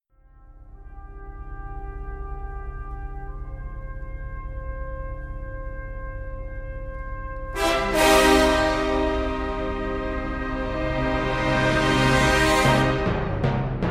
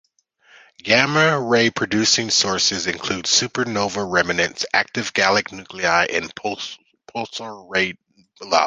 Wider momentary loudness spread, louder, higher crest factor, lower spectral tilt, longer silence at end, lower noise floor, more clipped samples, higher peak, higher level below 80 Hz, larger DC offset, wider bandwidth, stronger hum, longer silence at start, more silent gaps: first, 19 LU vs 14 LU; second, -22 LUFS vs -19 LUFS; about the same, 20 dB vs 20 dB; first, -5 dB/octave vs -2.5 dB/octave; about the same, 0 s vs 0 s; second, -51 dBFS vs -57 dBFS; neither; second, -4 dBFS vs 0 dBFS; first, -32 dBFS vs -54 dBFS; neither; first, 16 kHz vs 10 kHz; neither; second, 0.4 s vs 0.85 s; neither